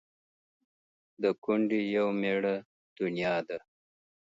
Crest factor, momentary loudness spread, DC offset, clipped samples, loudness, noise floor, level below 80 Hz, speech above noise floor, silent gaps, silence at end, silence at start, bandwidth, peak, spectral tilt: 18 dB; 8 LU; under 0.1%; under 0.1%; -31 LUFS; under -90 dBFS; -78 dBFS; over 60 dB; 1.38-1.42 s, 2.65-2.96 s; 0.65 s; 1.2 s; 7.8 kHz; -14 dBFS; -7.5 dB/octave